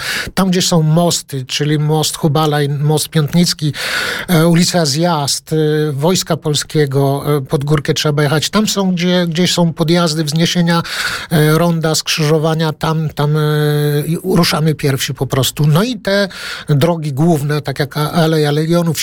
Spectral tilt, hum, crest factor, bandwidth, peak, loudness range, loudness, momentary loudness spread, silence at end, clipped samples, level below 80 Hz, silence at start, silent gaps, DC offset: -5 dB/octave; none; 12 dB; 18 kHz; -2 dBFS; 1 LU; -14 LUFS; 5 LU; 0 s; under 0.1%; -44 dBFS; 0 s; none; under 0.1%